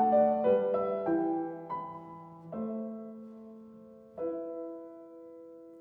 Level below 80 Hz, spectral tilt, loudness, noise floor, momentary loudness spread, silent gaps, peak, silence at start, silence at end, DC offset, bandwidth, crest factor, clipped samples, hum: -74 dBFS; -10 dB/octave; -32 LUFS; -53 dBFS; 23 LU; none; -16 dBFS; 0 s; 0 s; under 0.1%; 4.3 kHz; 18 dB; under 0.1%; none